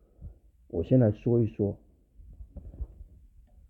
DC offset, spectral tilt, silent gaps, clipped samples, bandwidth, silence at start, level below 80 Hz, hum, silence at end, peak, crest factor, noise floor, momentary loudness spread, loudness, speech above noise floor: under 0.1%; -12 dB/octave; none; under 0.1%; 3.9 kHz; 0.2 s; -48 dBFS; none; 0.65 s; -12 dBFS; 18 dB; -55 dBFS; 24 LU; -27 LUFS; 30 dB